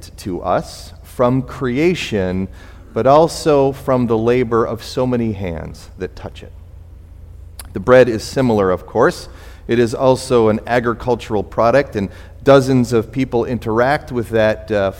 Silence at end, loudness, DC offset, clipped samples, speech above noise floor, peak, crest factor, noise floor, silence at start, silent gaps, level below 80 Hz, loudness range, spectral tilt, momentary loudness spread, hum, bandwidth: 0 s; -16 LUFS; under 0.1%; under 0.1%; 21 dB; 0 dBFS; 16 dB; -37 dBFS; 0 s; none; -38 dBFS; 4 LU; -6.5 dB/octave; 17 LU; none; 16.5 kHz